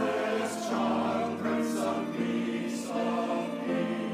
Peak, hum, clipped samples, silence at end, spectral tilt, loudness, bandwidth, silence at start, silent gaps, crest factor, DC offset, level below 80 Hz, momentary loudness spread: -18 dBFS; none; under 0.1%; 0 s; -5 dB/octave; -31 LUFS; 15.5 kHz; 0 s; none; 12 dB; under 0.1%; -76 dBFS; 3 LU